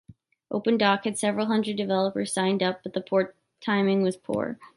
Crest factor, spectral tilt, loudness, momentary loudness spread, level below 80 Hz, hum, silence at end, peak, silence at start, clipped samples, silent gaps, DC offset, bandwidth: 18 dB; -5 dB/octave; -26 LUFS; 7 LU; -68 dBFS; none; 0.1 s; -8 dBFS; 0.1 s; under 0.1%; none; under 0.1%; 11.5 kHz